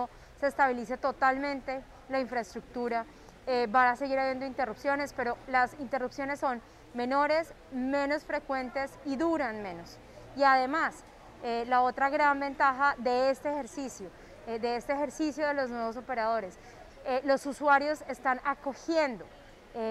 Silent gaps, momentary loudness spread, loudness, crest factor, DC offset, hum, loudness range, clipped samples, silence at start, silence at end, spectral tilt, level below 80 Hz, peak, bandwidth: none; 15 LU; -30 LUFS; 18 dB; under 0.1%; none; 4 LU; under 0.1%; 0 s; 0 s; -4 dB/octave; -60 dBFS; -12 dBFS; 13.5 kHz